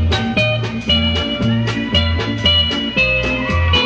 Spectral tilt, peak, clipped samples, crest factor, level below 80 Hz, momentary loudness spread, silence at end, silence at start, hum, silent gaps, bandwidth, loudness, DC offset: -5.5 dB/octave; -2 dBFS; under 0.1%; 14 dB; -26 dBFS; 4 LU; 0 s; 0 s; none; none; 8 kHz; -15 LUFS; under 0.1%